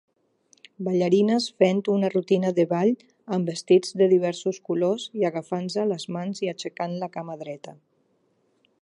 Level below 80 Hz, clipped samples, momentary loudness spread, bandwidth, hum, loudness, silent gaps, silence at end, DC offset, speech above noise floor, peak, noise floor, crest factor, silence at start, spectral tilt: -76 dBFS; under 0.1%; 13 LU; 11 kHz; none; -24 LUFS; none; 1.1 s; under 0.1%; 44 dB; -6 dBFS; -68 dBFS; 20 dB; 0.8 s; -6 dB/octave